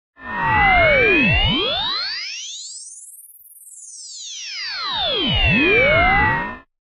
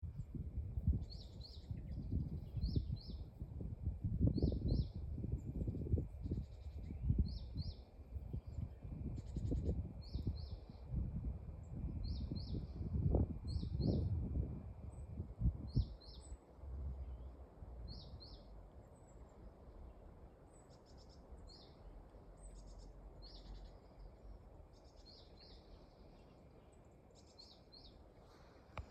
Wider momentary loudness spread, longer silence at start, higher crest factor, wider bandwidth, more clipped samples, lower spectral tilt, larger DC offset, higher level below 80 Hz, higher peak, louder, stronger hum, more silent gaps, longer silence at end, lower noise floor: about the same, 20 LU vs 22 LU; first, 0.2 s vs 0 s; second, 16 dB vs 22 dB; first, 15.5 kHz vs 8.6 kHz; neither; second, -3.5 dB/octave vs -8.5 dB/octave; neither; first, -32 dBFS vs -48 dBFS; first, -2 dBFS vs -22 dBFS; first, -16 LUFS vs -45 LUFS; neither; neither; first, 0.25 s vs 0 s; second, -44 dBFS vs -63 dBFS